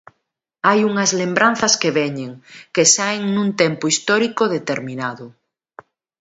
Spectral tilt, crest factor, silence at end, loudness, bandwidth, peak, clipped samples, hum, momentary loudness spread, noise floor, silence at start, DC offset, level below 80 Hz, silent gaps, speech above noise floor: -3 dB/octave; 20 dB; 0.9 s; -17 LUFS; 8.2 kHz; 0 dBFS; under 0.1%; none; 13 LU; -75 dBFS; 0.65 s; under 0.1%; -64 dBFS; none; 57 dB